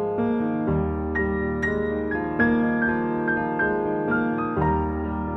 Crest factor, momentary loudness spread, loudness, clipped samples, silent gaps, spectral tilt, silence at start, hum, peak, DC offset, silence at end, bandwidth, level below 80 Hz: 16 dB; 4 LU; -24 LUFS; under 0.1%; none; -9 dB/octave; 0 s; none; -8 dBFS; under 0.1%; 0 s; 6.2 kHz; -38 dBFS